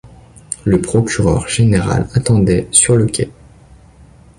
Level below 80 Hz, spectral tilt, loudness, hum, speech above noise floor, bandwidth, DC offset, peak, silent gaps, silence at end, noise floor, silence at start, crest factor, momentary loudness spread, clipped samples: -32 dBFS; -5 dB/octave; -14 LUFS; none; 30 dB; 11.5 kHz; under 0.1%; 0 dBFS; none; 1.1 s; -43 dBFS; 0.05 s; 16 dB; 11 LU; under 0.1%